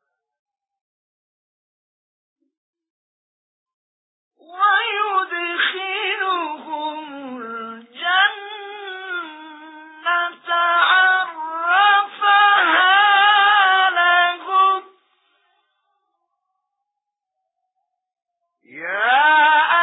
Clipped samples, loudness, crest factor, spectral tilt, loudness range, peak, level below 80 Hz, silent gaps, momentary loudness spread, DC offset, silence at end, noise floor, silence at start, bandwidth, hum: under 0.1%; -16 LUFS; 18 dB; -4.5 dB/octave; 10 LU; -2 dBFS; -84 dBFS; none; 19 LU; under 0.1%; 0 s; -82 dBFS; 4.5 s; 4 kHz; none